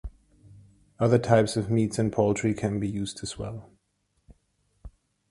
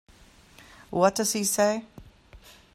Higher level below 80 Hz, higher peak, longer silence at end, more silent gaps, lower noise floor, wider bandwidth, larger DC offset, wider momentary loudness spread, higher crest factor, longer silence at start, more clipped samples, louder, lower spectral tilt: first, -50 dBFS vs -58 dBFS; first, -4 dBFS vs -8 dBFS; about the same, 0.4 s vs 0.4 s; neither; first, -73 dBFS vs -54 dBFS; second, 11.5 kHz vs 16 kHz; neither; first, 15 LU vs 10 LU; about the same, 24 dB vs 22 dB; second, 0.05 s vs 0.9 s; neither; about the same, -26 LUFS vs -25 LUFS; first, -6.5 dB/octave vs -3.5 dB/octave